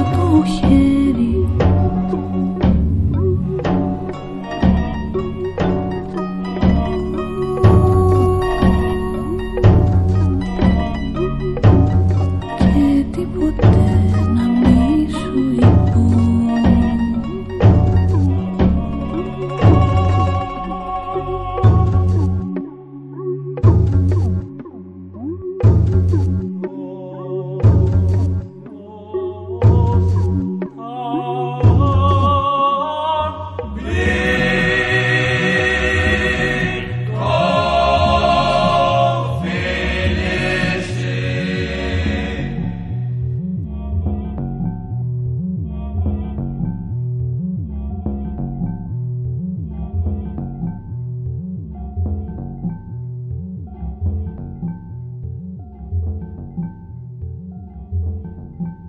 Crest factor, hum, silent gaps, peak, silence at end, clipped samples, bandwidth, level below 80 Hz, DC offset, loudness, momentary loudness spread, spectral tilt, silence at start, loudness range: 16 dB; none; none; 0 dBFS; 0 s; under 0.1%; 9.4 kHz; -26 dBFS; under 0.1%; -17 LUFS; 15 LU; -8 dB/octave; 0 s; 11 LU